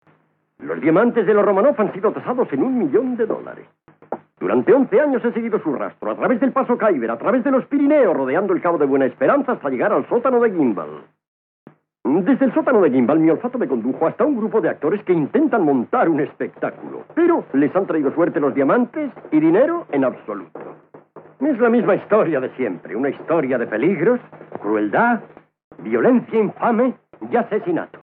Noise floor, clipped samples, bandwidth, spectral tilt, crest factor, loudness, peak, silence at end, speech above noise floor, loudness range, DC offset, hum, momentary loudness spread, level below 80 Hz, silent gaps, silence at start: -60 dBFS; under 0.1%; 3.9 kHz; -7 dB/octave; 16 dB; -18 LUFS; -4 dBFS; 0.05 s; 42 dB; 3 LU; under 0.1%; none; 11 LU; -82 dBFS; 11.28-11.66 s, 25.64-25.71 s; 0.6 s